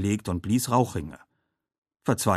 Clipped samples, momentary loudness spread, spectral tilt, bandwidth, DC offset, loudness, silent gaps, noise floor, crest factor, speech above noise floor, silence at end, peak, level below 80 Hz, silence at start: under 0.1%; 12 LU; -5.5 dB/octave; 14 kHz; under 0.1%; -27 LUFS; 1.78-1.82 s; -77 dBFS; 20 dB; 52 dB; 0 s; -6 dBFS; -52 dBFS; 0 s